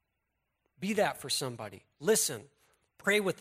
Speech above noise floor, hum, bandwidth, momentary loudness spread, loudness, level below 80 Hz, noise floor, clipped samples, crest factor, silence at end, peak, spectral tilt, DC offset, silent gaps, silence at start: 51 dB; none; 16 kHz; 16 LU; -31 LUFS; -74 dBFS; -82 dBFS; under 0.1%; 18 dB; 0.05 s; -16 dBFS; -2.5 dB/octave; under 0.1%; none; 0.8 s